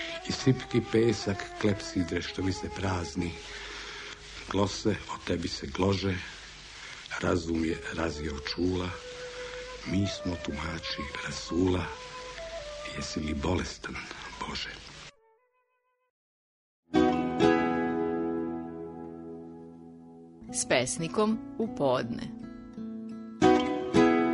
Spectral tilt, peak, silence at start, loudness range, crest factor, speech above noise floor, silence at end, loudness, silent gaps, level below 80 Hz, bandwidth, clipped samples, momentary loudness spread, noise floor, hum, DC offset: -5 dB/octave; -10 dBFS; 0 s; 6 LU; 22 dB; 45 dB; 0 s; -31 LUFS; 16.10-16.83 s; -50 dBFS; 10.5 kHz; under 0.1%; 16 LU; -75 dBFS; none; under 0.1%